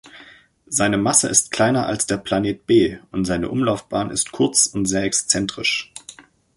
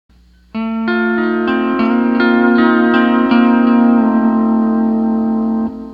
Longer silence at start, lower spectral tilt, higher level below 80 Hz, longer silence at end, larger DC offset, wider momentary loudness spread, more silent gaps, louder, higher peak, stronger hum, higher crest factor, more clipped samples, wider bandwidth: second, 0.05 s vs 0.55 s; second, -3 dB/octave vs -8.5 dB/octave; about the same, -48 dBFS vs -46 dBFS; first, 0.35 s vs 0 s; neither; about the same, 8 LU vs 7 LU; neither; second, -19 LUFS vs -13 LUFS; about the same, 0 dBFS vs 0 dBFS; neither; first, 20 dB vs 12 dB; neither; first, 12 kHz vs 5 kHz